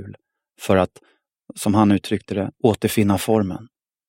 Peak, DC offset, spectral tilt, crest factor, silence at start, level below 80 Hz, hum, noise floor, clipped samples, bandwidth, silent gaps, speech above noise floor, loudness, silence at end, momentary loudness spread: 0 dBFS; under 0.1%; -6 dB/octave; 20 dB; 0 s; -54 dBFS; none; -43 dBFS; under 0.1%; 16.5 kHz; none; 24 dB; -20 LUFS; 0.45 s; 15 LU